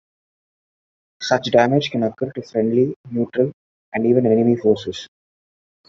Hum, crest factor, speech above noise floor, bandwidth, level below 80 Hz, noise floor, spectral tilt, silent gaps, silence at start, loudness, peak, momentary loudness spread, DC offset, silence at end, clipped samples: none; 18 dB; over 72 dB; 7.6 kHz; -60 dBFS; under -90 dBFS; -6.5 dB/octave; 2.96-3.04 s, 3.54-3.92 s; 1.2 s; -19 LUFS; -2 dBFS; 12 LU; under 0.1%; 0.85 s; under 0.1%